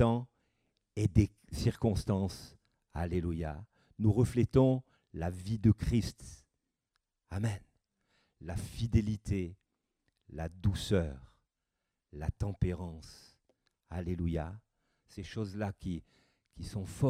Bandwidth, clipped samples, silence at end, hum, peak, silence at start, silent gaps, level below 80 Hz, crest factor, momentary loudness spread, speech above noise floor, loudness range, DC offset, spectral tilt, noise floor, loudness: 14.5 kHz; under 0.1%; 0 s; none; -12 dBFS; 0 s; none; -48 dBFS; 22 dB; 20 LU; 54 dB; 9 LU; under 0.1%; -7.5 dB/octave; -87 dBFS; -34 LUFS